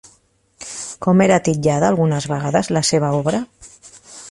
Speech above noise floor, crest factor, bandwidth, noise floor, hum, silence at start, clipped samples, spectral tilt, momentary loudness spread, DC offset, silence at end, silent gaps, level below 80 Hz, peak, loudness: 41 dB; 16 dB; 11.5 kHz; -57 dBFS; none; 0.6 s; under 0.1%; -5.5 dB/octave; 19 LU; under 0.1%; 0 s; none; -52 dBFS; -2 dBFS; -17 LUFS